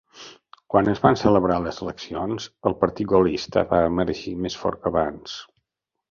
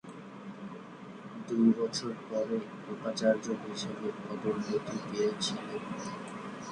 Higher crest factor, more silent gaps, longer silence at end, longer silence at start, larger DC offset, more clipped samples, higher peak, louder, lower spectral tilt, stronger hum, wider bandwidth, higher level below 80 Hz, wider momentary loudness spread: about the same, 20 dB vs 20 dB; neither; first, 0.65 s vs 0 s; about the same, 0.15 s vs 0.05 s; neither; neither; first, -2 dBFS vs -14 dBFS; first, -22 LUFS vs -33 LUFS; first, -6.5 dB/octave vs -5 dB/octave; neither; second, 7.4 kHz vs 10.5 kHz; first, -46 dBFS vs -72 dBFS; about the same, 16 LU vs 17 LU